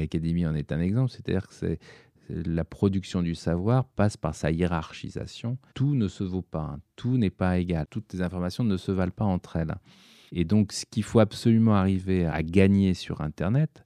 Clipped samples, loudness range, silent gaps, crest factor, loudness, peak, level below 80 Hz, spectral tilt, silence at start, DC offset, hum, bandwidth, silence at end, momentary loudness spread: under 0.1%; 5 LU; none; 20 dB; -27 LUFS; -6 dBFS; -46 dBFS; -7.5 dB/octave; 0 s; under 0.1%; none; 12 kHz; 0.2 s; 12 LU